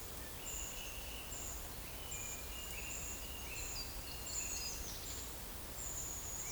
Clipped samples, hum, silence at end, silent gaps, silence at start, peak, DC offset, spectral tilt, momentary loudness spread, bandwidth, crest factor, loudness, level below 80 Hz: under 0.1%; none; 0 s; none; 0 s; -28 dBFS; under 0.1%; -1.5 dB/octave; 4 LU; over 20 kHz; 16 dB; -43 LUFS; -52 dBFS